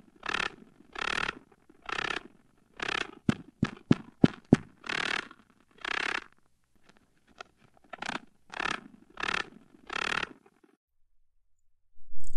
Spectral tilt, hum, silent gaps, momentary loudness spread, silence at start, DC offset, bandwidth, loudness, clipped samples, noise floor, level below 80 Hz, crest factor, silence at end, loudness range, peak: -5 dB/octave; none; 10.77-10.88 s; 18 LU; 0.25 s; under 0.1%; 11.5 kHz; -32 LUFS; under 0.1%; -65 dBFS; -54 dBFS; 28 dB; 0 s; 8 LU; -4 dBFS